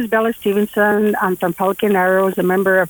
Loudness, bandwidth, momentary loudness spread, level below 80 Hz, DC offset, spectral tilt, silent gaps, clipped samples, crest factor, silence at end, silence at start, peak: -16 LUFS; over 20 kHz; 4 LU; -56 dBFS; under 0.1%; -6 dB/octave; none; under 0.1%; 12 dB; 0 s; 0 s; -4 dBFS